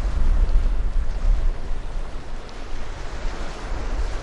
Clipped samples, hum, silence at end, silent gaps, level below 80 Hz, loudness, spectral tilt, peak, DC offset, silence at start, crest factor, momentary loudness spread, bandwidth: under 0.1%; none; 0 s; none; -22 dBFS; -29 LUFS; -6 dB/octave; -6 dBFS; under 0.1%; 0 s; 14 dB; 12 LU; 8 kHz